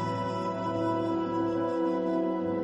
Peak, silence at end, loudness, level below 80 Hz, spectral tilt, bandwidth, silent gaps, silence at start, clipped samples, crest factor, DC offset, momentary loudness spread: -18 dBFS; 0 s; -30 LUFS; -62 dBFS; -8 dB/octave; 8 kHz; none; 0 s; under 0.1%; 12 dB; under 0.1%; 3 LU